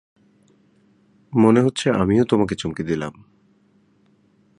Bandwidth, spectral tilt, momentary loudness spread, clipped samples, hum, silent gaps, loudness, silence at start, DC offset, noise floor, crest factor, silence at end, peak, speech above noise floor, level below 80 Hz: 11 kHz; -6.5 dB/octave; 11 LU; under 0.1%; none; none; -19 LUFS; 1.3 s; under 0.1%; -59 dBFS; 20 dB; 1.45 s; -2 dBFS; 41 dB; -50 dBFS